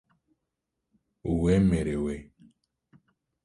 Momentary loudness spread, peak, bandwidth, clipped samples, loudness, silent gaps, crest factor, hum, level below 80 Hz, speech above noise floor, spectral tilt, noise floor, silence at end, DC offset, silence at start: 15 LU; -12 dBFS; 11.5 kHz; under 0.1%; -26 LUFS; none; 18 dB; none; -44 dBFS; 59 dB; -8 dB/octave; -84 dBFS; 1.2 s; under 0.1%; 1.25 s